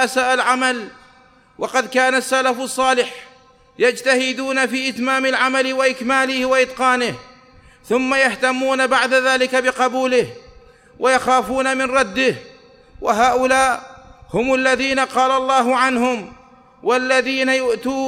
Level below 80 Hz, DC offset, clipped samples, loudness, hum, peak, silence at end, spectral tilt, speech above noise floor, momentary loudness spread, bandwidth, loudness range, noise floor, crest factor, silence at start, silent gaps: -52 dBFS; under 0.1%; under 0.1%; -17 LUFS; none; -2 dBFS; 0 s; -2.5 dB/octave; 33 dB; 7 LU; 15 kHz; 2 LU; -50 dBFS; 16 dB; 0 s; none